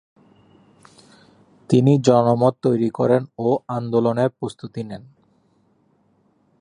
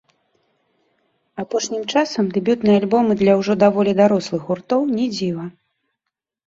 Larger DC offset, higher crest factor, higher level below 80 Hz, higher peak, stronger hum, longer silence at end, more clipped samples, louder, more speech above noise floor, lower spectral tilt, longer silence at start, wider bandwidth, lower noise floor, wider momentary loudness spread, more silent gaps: neither; about the same, 20 dB vs 18 dB; about the same, -62 dBFS vs -60 dBFS; about the same, -2 dBFS vs -2 dBFS; first, 50 Hz at -60 dBFS vs none; first, 1.6 s vs 0.95 s; neither; about the same, -19 LUFS vs -18 LUFS; second, 43 dB vs 64 dB; first, -8 dB/octave vs -6 dB/octave; first, 1.7 s vs 1.35 s; first, 10.5 kHz vs 7.8 kHz; second, -62 dBFS vs -81 dBFS; first, 16 LU vs 10 LU; neither